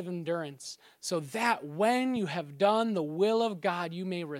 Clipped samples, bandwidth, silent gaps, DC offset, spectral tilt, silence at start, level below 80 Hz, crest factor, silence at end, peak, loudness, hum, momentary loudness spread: under 0.1%; 16.5 kHz; none; under 0.1%; -5 dB/octave; 0 s; -82 dBFS; 18 dB; 0 s; -12 dBFS; -30 LUFS; none; 9 LU